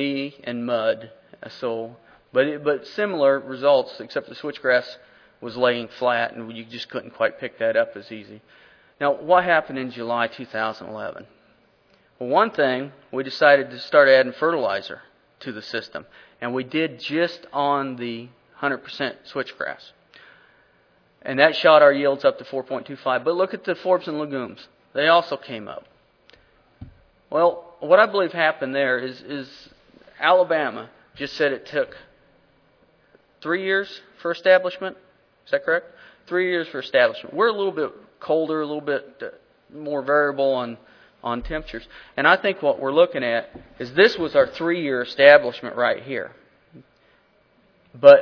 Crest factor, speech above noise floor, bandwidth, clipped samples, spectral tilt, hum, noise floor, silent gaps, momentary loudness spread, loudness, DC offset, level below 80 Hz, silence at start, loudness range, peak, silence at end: 22 dB; 39 dB; 5.4 kHz; under 0.1%; -6 dB/octave; none; -60 dBFS; none; 18 LU; -21 LUFS; under 0.1%; -56 dBFS; 0 s; 7 LU; 0 dBFS; 0 s